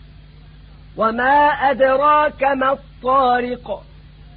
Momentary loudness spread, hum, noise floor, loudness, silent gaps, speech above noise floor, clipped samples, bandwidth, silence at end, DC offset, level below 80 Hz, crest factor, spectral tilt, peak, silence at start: 14 LU; none; -42 dBFS; -16 LUFS; none; 25 dB; under 0.1%; 4.9 kHz; 0.55 s; under 0.1%; -44 dBFS; 14 dB; -9.5 dB/octave; -4 dBFS; 0.95 s